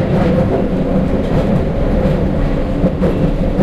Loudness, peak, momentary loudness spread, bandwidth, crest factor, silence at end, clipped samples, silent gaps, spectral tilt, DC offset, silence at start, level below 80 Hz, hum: -15 LUFS; -2 dBFS; 3 LU; 8.4 kHz; 12 dB; 0 s; under 0.1%; none; -9 dB/octave; under 0.1%; 0 s; -20 dBFS; none